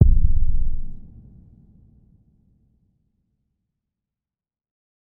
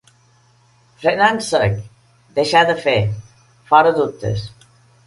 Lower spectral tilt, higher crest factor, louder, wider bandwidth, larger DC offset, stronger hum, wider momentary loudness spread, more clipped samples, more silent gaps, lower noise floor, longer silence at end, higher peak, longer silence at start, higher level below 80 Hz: first, -15.5 dB/octave vs -5 dB/octave; about the same, 20 dB vs 18 dB; second, -24 LUFS vs -17 LUFS; second, 0.7 kHz vs 11.5 kHz; neither; neither; first, 27 LU vs 13 LU; neither; neither; first, under -90 dBFS vs -54 dBFS; first, 4.2 s vs 0.6 s; about the same, 0 dBFS vs 0 dBFS; second, 0 s vs 1 s; first, -24 dBFS vs -46 dBFS